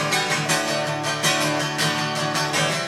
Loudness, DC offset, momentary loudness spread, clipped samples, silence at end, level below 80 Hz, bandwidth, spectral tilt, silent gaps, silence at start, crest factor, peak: -21 LUFS; under 0.1%; 3 LU; under 0.1%; 0 s; -60 dBFS; 16.5 kHz; -2.5 dB/octave; none; 0 s; 16 dB; -6 dBFS